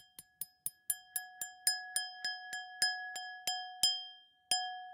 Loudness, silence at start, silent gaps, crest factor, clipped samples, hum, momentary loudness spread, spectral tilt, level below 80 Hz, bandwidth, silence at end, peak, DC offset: -36 LUFS; 0 s; none; 28 dB; under 0.1%; none; 13 LU; 3 dB/octave; -84 dBFS; 17 kHz; 0 s; -12 dBFS; under 0.1%